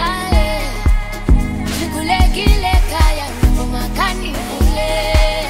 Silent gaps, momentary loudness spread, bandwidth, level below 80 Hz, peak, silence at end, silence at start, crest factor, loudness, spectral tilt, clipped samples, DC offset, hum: none; 6 LU; 16 kHz; -16 dBFS; 0 dBFS; 0 s; 0 s; 14 dB; -17 LUFS; -5 dB/octave; under 0.1%; under 0.1%; none